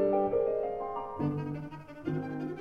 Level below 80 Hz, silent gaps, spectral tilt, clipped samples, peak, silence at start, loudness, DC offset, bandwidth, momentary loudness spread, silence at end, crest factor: -60 dBFS; none; -10 dB/octave; under 0.1%; -16 dBFS; 0 s; -33 LUFS; under 0.1%; 6.4 kHz; 12 LU; 0 s; 16 dB